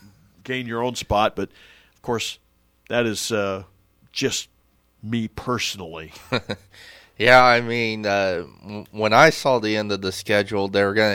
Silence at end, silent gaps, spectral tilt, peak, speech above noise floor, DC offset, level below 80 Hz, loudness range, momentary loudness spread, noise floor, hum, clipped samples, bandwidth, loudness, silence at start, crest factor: 0 s; none; -4 dB/octave; -2 dBFS; 40 dB; under 0.1%; -50 dBFS; 9 LU; 20 LU; -62 dBFS; none; under 0.1%; 17 kHz; -21 LUFS; 0.45 s; 20 dB